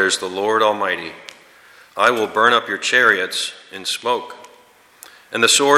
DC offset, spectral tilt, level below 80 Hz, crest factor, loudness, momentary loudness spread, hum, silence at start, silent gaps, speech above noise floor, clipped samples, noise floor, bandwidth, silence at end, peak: under 0.1%; -1 dB/octave; -68 dBFS; 18 dB; -17 LUFS; 14 LU; none; 0 s; none; 32 dB; under 0.1%; -50 dBFS; 16 kHz; 0 s; 0 dBFS